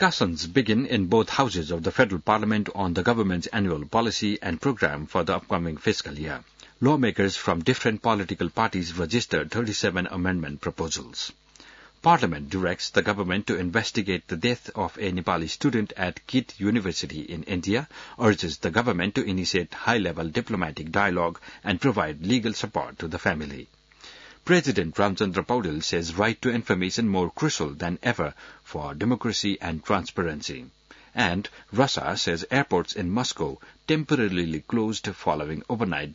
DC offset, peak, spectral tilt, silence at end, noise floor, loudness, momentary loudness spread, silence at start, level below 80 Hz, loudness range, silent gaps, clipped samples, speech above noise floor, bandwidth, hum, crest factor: under 0.1%; -6 dBFS; -5 dB/octave; 0 s; -51 dBFS; -26 LUFS; 8 LU; 0 s; -52 dBFS; 3 LU; none; under 0.1%; 25 dB; 7.8 kHz; none; 20 dB